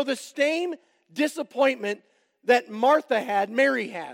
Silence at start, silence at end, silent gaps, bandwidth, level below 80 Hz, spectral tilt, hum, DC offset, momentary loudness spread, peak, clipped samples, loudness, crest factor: 0 s; 0 s; none; 16.5 kHz; under -90 dBFS; -3.5 dB/octave; none; under 0.1%; 12 LU; -6 dBFS; under 0.1%; -24 LUFS; 18 dB